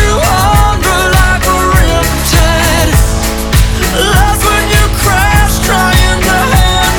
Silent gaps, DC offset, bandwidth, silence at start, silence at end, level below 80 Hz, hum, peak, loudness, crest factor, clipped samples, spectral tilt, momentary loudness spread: none; 0.3%; 20 kHz; 0 s; 0 s; -12 dBFS; none; 0 dBFS; -9 LUFS; 8 dB; 0.9%; -4 dB/octave; 3 LU